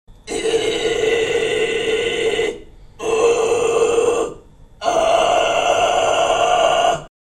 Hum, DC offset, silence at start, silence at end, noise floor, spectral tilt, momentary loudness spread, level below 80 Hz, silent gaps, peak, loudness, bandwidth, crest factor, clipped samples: none; under 0.1%; 0.1 s; 0.3 s; -41 dBFS; -2.5 dB/octave; 9 LU; -44 dBFS; none; -4 dBFS; -17 LUFS; 12.5 kHz; 14 dB; under 0.1%